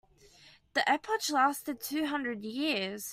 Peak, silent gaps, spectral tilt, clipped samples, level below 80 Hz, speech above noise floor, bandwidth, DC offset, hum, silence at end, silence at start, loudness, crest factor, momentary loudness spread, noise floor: -14 dBFS; none; -2.5 dB/octave; under 0.1%; -72 dBFS; 28 dB; 16 kHz; under 0.1%; none; 0 s; 0.45 s; -31 LUFS; 18 dB; 7 LU; -59 dBFS